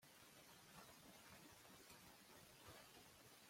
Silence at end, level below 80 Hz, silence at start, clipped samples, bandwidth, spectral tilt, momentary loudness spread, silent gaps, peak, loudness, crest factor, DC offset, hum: 0 s; -84 dBFS; 0 s; under 0.1%; 16.5 kHz; -2.5 dB/octave; 2 LU; none; -48 dBFS; -64 LUFS; 18 dB; under 0.1%; none